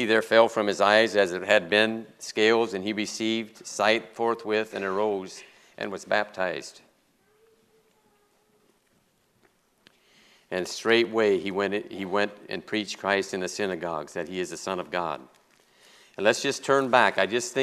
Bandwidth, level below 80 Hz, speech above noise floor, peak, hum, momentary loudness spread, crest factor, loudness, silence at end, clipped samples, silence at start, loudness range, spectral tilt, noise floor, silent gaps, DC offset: 13.5 kHz; -74 dBFS; 42 dB; -4 dBFS; none; 13 LU; 24 dB; -25 LUFS; 0 s; under 0.1%; 0 s; 10 LU; -3.5 dB/octave; -67 dBFS; none; under 0.1%